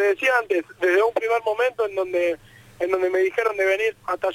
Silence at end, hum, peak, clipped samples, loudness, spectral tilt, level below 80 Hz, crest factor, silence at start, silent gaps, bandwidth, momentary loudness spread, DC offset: 0 s; none; -8 dBFS; under 0.1%; -22 LUFS; -3.5 dB/octave; -62 dBFS; 14 dB; 0 s; none; 16 kHz; 6 LU; under 0.1%